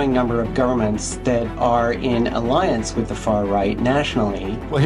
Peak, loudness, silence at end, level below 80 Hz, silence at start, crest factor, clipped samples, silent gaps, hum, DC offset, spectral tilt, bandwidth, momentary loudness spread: -6 dBFS; -20 LUFS; 0 s; -34 dBFS; 0 s; 14 dB; under 0.1%; none; none; under 0.1%; -6 dB/octave; 11 kHz; 4 LU